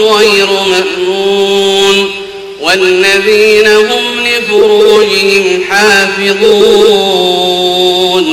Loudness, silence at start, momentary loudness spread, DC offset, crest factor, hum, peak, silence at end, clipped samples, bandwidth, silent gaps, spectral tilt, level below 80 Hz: -7 LUFS; 0 s; 5 LU; under 0.1%; 8 dB; none; 0 dBFS; 0 s; 3%; 15.5 kHz; none; -2.5 dB/octave; -44 dBFS